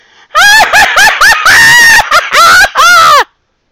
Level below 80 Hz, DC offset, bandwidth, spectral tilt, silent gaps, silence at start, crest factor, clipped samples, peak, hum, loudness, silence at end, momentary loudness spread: -34 dBFS; under 0.1%; over 20 kHz; 0.5 dB/octave; none; 0.35 s; 4 dB; 7%; 0 dBFS; none; -2 LUFS; 0.45 s; 6 LU